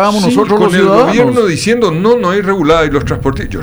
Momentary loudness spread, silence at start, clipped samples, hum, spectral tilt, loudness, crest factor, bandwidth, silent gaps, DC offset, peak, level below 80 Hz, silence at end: 6 LU; 0 s; under 0.1%; none; -6 dB/octave; -10 LUFS; 10 dB; over 20 kHz; none; under 0.1%; 0 dBFS; -30 dBFS; 0 s